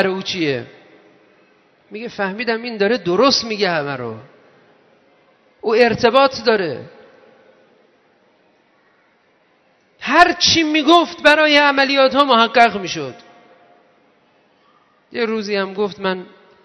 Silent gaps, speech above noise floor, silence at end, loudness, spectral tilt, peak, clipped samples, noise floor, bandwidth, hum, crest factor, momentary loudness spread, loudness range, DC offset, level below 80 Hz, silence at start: none; 42 dB; 0.4 s; -15 LUFS; -3.5 dB/octave; 0 dBFS; under 0.1%; -58 dBFS; 12 kHz; none; 18 dB; 16 LU; 12 LU; under 0.1%; -56 dBFS; 0 s